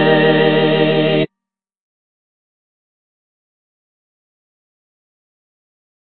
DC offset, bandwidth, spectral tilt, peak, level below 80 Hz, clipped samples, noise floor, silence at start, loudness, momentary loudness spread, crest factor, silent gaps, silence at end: under 0.1%; 4.6 kHz; -10 dB/octave; 0 dBFS; -70 dBFS; under 0.1%; -84 dBFS; 0 s; -13 LUFS; 7 LU; 18 dB; none; 4.9 s